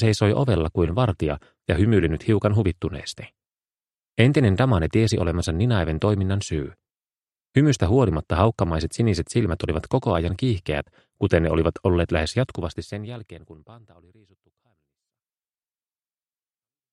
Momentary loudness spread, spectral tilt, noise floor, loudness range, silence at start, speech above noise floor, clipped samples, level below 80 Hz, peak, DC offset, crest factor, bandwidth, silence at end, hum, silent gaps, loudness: 12 LU; -7 dB/octave; under -90 dBFS; 6 LU; 0 s; over 68 dB; under 0.1%; -38 dBFS; 0 dBFS; under 0.1%; 22 dB; 11.5 kHz; 3.15 s; none; none; -22 LUFS